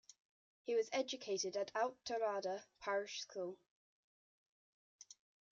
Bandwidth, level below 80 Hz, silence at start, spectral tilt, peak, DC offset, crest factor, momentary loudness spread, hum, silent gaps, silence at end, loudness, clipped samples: 7.6 kHz; -88 dBFS; 0.65 s; -1 dB/octave; -26 dBFS; under 0.1%; 18 dB; 17 LU; none; 3.70-4.99 s; 0.4 s; -42 LUFS; under 0.1%